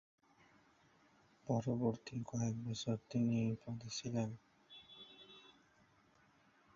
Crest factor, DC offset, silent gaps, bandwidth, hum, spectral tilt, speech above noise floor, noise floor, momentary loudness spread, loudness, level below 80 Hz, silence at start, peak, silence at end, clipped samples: 20 dB; under 0.1%; none; 7.6 kHz; none; -7 dB/octave; 32 dB; -71 dBFS; 21 LU; -41 LUFS; -72 dBFS; 1.45 s; -24 dBFS; 1.25 s; under 0.1%